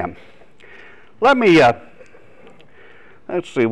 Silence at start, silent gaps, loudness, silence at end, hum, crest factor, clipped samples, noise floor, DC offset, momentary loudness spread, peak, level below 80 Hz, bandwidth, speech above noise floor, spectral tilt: 0 s; none; -15 LUFS; 0 s; none; 12 dB; under 0.1%; -47 dBFS; 0.7%; 17 LU; -6 dBFS; -54 dBFS; 10.5 kHz; 32 dB; -6 dB/octave